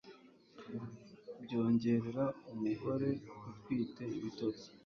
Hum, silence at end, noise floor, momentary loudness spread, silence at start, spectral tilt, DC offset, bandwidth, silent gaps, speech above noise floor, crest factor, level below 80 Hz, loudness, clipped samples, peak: none; 0.1 s; -60 dBFS; 18 LU; 0.05 s; -7.5 dB/octave; under 0.1%; 6.6 kHz; none; 23 dB; 16 dB; -72 dBFS; -38 LUFS; under 0.1%; -22 dBFS